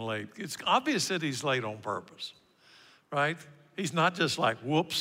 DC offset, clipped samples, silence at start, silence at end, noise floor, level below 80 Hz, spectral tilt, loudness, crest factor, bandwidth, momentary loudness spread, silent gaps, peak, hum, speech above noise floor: under 0.1%; under 0.1%; 0 s; 0 s; -59 dBFS; -78 dBFS; -4 dB/octave; -30 LUFS; 18 dB; 16 kHz; 15 LU; none; -12 dBFS; none; 29 dB